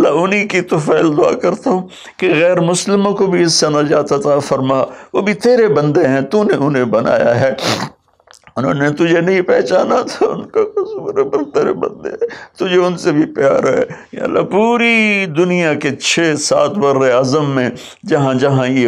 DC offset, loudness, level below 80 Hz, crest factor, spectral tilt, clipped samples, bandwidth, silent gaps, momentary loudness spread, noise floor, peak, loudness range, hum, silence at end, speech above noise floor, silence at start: under 0.1%; -14 LUFS; -56 dBFS; 12 dB; -5 dB/octave; under 0.1%; 14 kHz; none; 8 LU; -47 dBFS; -2 dBFS; 3 LU; none; 0 s; 34 dB; 0 s